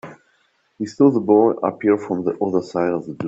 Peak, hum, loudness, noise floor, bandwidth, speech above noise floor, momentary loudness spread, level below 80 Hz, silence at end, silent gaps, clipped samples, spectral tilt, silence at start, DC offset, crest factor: -2 dBFS; none; -18 LUFS; -63 dBFS; 7.8 kHz; 45 dB; 8 LU; -64 dBFS; 0 s; none; under 0.1%; -8 dB/octave; 0.05 s; under 0.1%; 18 dB